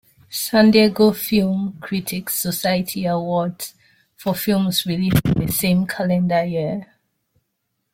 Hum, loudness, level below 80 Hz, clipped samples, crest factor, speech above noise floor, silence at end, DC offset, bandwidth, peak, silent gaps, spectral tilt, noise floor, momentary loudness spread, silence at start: none; -19 LUFS; -48 dBFS; under 0.1%; 18 dB; 56 dB; 1.1 s; under 0.1%; 16.5 kHz; -2 dBFS; none; -5.5 dB/octave; -74 dBFS; 12 LU; 0.3 s